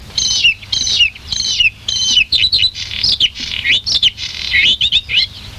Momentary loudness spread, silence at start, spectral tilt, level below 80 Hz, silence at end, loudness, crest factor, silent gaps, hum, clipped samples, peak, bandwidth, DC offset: 6 LU; 0 s; 1 dB/octave; -36 dBFS; 0 s; -12 LUFS; 14 dB; none; none; under 0.1%; -2 dBFS; 15.5 kHz; under 0.1%